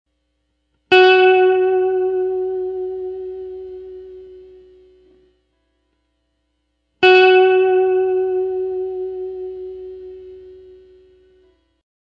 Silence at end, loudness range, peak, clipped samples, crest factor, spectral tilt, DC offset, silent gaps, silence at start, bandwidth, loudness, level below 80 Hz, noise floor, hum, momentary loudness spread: 1.6 s; 17 LU; 0 dBFS; under 0.1%; 18 dB; -5 dB/octave; under 0.1%; none; 0.9 s; 5.8 kHz; -15 LUFS; -58 dBFS; -69 dBFS; 60 Hz at -60 dBFS; 24 LU